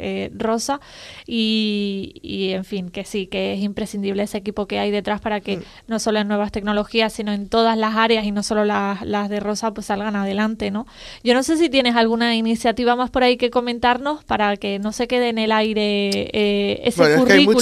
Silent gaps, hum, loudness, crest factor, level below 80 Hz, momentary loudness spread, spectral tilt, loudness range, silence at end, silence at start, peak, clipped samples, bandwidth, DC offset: none; none; -20 LUFS; 20 dB; -48 dBFS; 9 LU; -4.5 dB/octave; 6 LU; 0 s; 0 s; 0 dBFS; under 0.1%; 14 kHz; under 0.1%